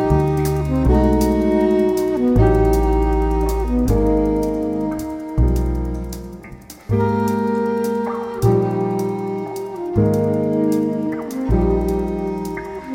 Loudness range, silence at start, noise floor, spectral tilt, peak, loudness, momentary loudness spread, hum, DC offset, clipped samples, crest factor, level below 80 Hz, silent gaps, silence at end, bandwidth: 5 LU; 0 s; -38 dBFS; -8 dB/octave; -2 dBFS; -19 LUFS; 10 LU; none; under 0.1%; under 0.1%; 16 dB; -24 dBFS; none; 0 s; 17 kHz